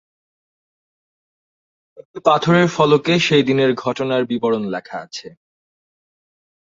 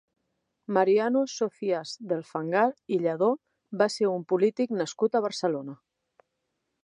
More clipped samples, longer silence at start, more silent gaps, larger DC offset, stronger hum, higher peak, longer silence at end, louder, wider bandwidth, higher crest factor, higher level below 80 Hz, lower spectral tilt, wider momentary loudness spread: neither; first, 2 s vs 0.7 s; first, 2.05-2.14 s vs none; neither; neither; first, 0 dBFS vs -8 dBFS; first, 1.4 s vs 1.1 s; first, -17 LUFS vs -27 LUFS; second, 7.8 kHz vs 11 kHz; about the same, 20 dB vs 20 dB; first, -60 dBFS vs -82 dBFS; about the same, -5.5 dB/octave vs -5.5 dB/octave; first, 15 LU vs 9 LU